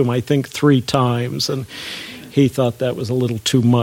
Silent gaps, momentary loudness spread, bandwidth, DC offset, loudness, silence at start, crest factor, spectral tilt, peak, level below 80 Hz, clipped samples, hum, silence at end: none; 11 LU; 17 kHz; under 0.1%; -18 LUFS; 0 s; 16 dB; -6 dB/octave; -2 dBFS; -52 dBFS; under 0.1%; none; 0 s